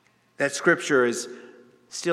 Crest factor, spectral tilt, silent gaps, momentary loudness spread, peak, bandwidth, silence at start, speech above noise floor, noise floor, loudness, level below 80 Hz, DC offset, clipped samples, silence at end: 18 dB; -3.5 dB/octave; none; 17 LU; -6 dBFS; 14 kHz; 0.4 s; 27 dB; -50 dBFS; -23 LUFS; -86 dBFS; under 0.1%; under 0.1%; 0 s